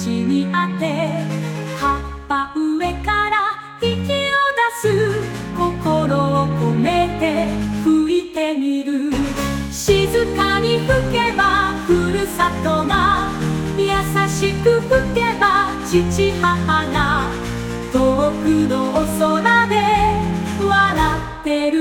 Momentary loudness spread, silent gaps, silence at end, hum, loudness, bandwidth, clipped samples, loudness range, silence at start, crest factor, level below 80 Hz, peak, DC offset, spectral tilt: 6 LU; none; 0 s; none; -18 LUFS; 18 kHz; under 0.1%; 2 LU; 0 s; 16 dB; -34 dBFS; -2 dBFS; under 0.1%; -5.5 dB/octave